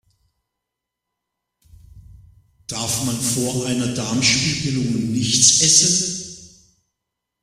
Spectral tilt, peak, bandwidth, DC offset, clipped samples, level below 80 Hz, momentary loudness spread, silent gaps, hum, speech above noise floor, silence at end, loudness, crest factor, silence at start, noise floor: -2.5 dB/octave; 0 dBFS; 16 kHz; under 0.1%; under 0.1%; -50 dBFS; 15 LU; none; none; 63 dB; 0.95 s; -17 LUFS; 22 dB; 1.95 s; -82 dBFS